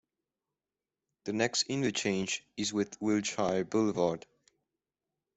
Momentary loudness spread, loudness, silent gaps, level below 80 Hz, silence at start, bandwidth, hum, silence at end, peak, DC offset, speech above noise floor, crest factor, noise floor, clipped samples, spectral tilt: 6 LU; -32 LUFS; none; -70 dBFS; 1.25 s; 8.4 kHz; none; 1.2 s; -14 dBFS; under 0.1%; over 59 dB; 20 dB; under -90 dBFS; under 0.1%; -4 dB/octave